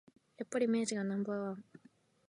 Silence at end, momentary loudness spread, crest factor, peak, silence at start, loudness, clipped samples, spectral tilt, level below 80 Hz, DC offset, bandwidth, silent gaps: 0.7 s; 13 LU; 16 dB; -22 dBFS; 0.4 s; -36 LUFS; under 0.1%; -5 dB/octave; -84 dBFS; under 0.1%; 11.5 kHz; none